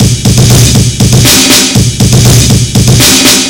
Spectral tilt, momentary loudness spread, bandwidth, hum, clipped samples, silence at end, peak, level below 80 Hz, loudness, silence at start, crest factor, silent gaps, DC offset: -3.5 dB/octave; 4 LU; over 20 kHz; none; 10%; 0 s; 0 dBFS; -18 dBFS; -4 LUFS; 0 s; 4 dB; none; under 0.1%